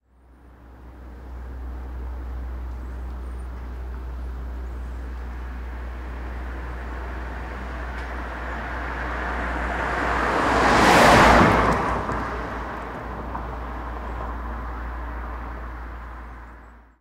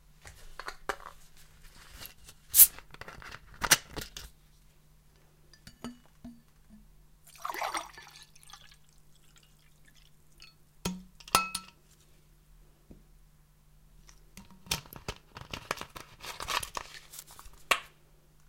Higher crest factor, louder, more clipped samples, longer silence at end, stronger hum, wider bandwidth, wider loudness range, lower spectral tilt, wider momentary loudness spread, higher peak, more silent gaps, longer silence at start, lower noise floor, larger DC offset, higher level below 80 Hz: second, 20 dB vs 34 dB; first, -24 LUFS vs -28 LUFS; neither; second, 0.2 s vs 0.65 s; neither; about the same, 16 kHz vs 16.5 kHz; about the same, 17 LU vs 18 LU; first, -5 dB/octave vs -0.5 dB/octave; second, 20 LU vs 26 LU; about the same, -4 dBFS vs -2 dBFS; neither; first, 0.4 s vs 0.25 s; second, -51 dBFS vs -61 dBFS; neither; first, -32 dBFS vs -56 dBFS